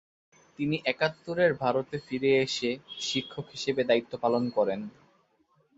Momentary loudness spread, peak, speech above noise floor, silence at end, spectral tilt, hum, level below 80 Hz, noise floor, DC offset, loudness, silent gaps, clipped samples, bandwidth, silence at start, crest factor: 9 LU; -10 dBFS; 40 dB; 0.9 s; -4.5 dB/octave; none; -68 dBFS; -69 dBFS; under 0.1%; -29 LUFS; none; under 0.1%; 8 kHz; 0.6 s; 20 dB